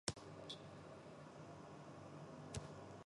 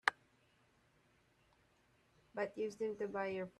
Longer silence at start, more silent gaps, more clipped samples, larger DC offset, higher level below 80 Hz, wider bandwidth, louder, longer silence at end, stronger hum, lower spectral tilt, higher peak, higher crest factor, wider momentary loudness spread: about the same, 0.05 s vs 0.05 s; neither; neither; neither; first, -70 dBFS vs -82 dBFS; about the same, 11.5 kHz vs 12 kHz; second, -55 LUFS vs -42 LUFS; about the same, 0 s vs 0.1 s; neither; about the same, -4 dB/octave vs -4.5 dB/octave; second, -24 dBFS vs -12 dBFS; about the same, 30 dB vs 34 dB; about the same, 6 LU vs 4 LU